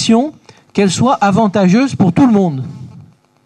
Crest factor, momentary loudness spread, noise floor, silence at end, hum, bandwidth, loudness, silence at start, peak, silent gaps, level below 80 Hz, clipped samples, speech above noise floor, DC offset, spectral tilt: 12 dB; 13 LU; -41 dBFS; 0.45 s; none; 10.5 kHz; -12 LUFS; 0 s; 0 dBFS; none; -50 dBFS; under 0.1%; 30 dB; under 0.1%; -6 dB/octave